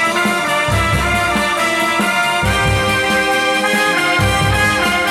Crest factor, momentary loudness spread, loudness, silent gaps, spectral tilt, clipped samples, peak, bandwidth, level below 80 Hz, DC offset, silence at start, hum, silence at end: 12 dB; 1 LU; -14 LUFS; none; -3.5 dB/octave; under 0.1%; -2 dBFS; 17 kHz; -30 dBFS; under 0.1%; 0 s; none; 0 s